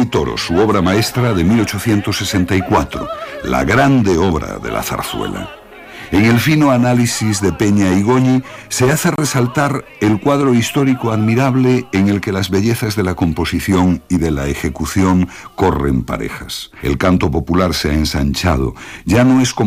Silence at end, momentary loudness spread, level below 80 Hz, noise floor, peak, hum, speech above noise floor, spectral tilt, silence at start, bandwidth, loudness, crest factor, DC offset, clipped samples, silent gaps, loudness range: 0 s; 10 LU; -32 dBFS; -34 dBFS; -2 dBFS; none; 20 dB; -5.5 dB/octave; 0 s; 15.5 kHz; -15 LUFS; 14 dB; under 0.1%; under 0.1%; none; 3 LU